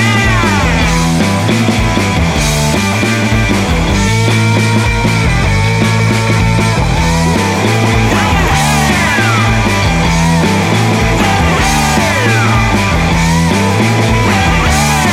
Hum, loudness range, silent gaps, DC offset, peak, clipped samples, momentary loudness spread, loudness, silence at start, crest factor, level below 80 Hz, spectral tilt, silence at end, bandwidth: none; 1 LU; none; under 0.1%; 0 dBFS; under 0.1%; 2 LU; -10 LUFS; 0 s; 10 dB; -20 dBFS; -5 dB/octave; 0 s; 16 kHz